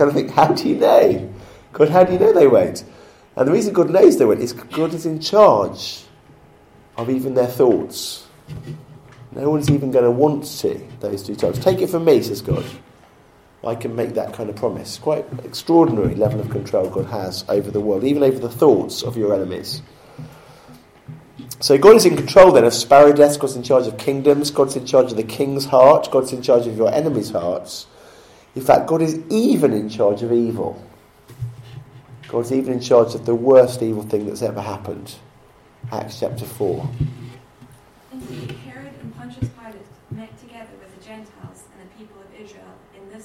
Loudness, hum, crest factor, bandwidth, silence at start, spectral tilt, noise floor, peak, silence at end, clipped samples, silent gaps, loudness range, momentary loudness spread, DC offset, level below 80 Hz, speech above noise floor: -17 LUFS; none; 18 dB; 16.5 kHz; 0 s; -6 dB/octave; -50 dBFS; 0 dBFS; 0.05 s; under 0.1%; none; 15 LU; 21 LU; under 0.1%; -50 dBFS; 34 dB